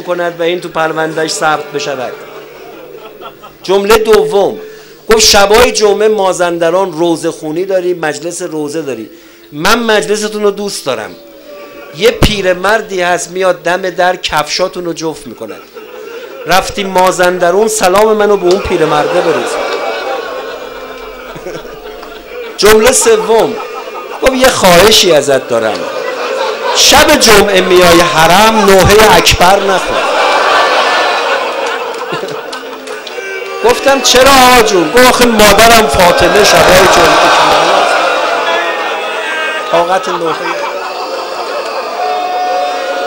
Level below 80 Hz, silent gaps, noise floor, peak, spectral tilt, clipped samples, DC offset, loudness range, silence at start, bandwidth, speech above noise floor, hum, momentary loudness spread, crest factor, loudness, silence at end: -30 dBFS; none; -30 dBFS; 0 dBFS; -2.5 dB/octave; 0.9%; under 0.1%; 9 LU; 0 s; over 20 kHz; 22 dB; none; 19 LU; 10 dB; -8 LUFS; 0 s